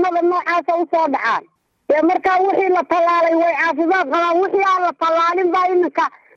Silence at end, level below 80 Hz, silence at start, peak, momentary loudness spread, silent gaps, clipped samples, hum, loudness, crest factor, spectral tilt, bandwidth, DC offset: 0.3 s; -66 dBFS; 0 s; -6 dBFS; 3 LU; none; under 0.1%; none; -16 LUFS; 10 dB; -4 dB/octave; 7.4 kHz; under 0.1%